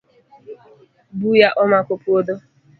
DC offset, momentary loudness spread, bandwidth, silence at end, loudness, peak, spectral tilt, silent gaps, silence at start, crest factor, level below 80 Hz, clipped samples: under 0.1%; 15 LU; 4.8 kHz; 0.4 s; -17 LUFS; 0 dBFS; -7.5 dB/octave; none; 0.5 s; 20 dB; -64 dBFS; under 0.1%